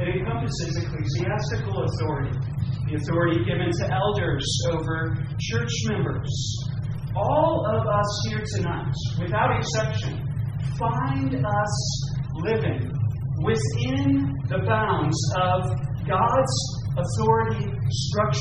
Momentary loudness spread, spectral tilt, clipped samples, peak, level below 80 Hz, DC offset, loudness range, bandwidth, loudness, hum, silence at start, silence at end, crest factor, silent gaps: 6 LU; -5.5 dB/octave; under 0.1%; -6 dBFS; -40 dBFS; under 0.1%; 3 LU; 9.4 kHz; -25 LUFS; none; 0 s; 0 s; 18 dB; none